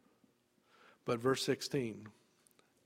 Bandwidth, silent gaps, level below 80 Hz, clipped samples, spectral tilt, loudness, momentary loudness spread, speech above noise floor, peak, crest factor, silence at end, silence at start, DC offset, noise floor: 16 kHz; none; -76 dBFS; under 0.1%; -4.5 dB/octave; -37 LUFS; 17 LU; 37 dB; -20 dBFS; 20 dB; 0.75 s; 1.05 s; under 0.1%; -73 dBFS